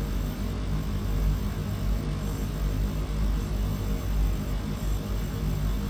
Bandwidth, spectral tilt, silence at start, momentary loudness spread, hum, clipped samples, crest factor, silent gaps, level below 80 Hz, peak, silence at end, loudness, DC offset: 19 kHz; -6.5 dB/octave; 0 s; 3 LU; none; under 0.1%; 12 dB; none; -30 dBFS; -16 dBFS; 0 s; -30 LUFS; under 0.1%